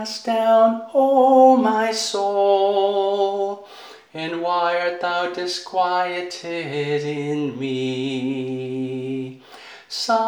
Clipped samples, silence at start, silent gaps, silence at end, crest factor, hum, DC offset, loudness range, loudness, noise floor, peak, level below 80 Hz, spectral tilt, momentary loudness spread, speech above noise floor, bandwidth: under 0.1%; 0 s; none; 0 s; 18 dB; none; under 0.1%; 8 LU; -20 LUFS; -43 dBFS; -2 dBFS; -78 dBFS; -4.5 dB/octave; 13 LU; 23 dB; 19.5 kHz